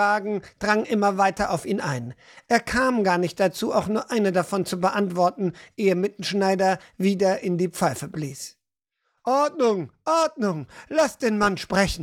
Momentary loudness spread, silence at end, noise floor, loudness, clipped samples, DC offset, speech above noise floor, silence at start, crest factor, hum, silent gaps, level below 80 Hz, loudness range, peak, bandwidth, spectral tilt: 9 LU; 0 s; -79 dBFS; -23 LUFS; under 0.1%; under 0.1%; 56 dB; 0 s; 18 dB; none; none; -50 dBFS; 2 LU; -6 dBFS; 16.5 kHz; -5 dB/octave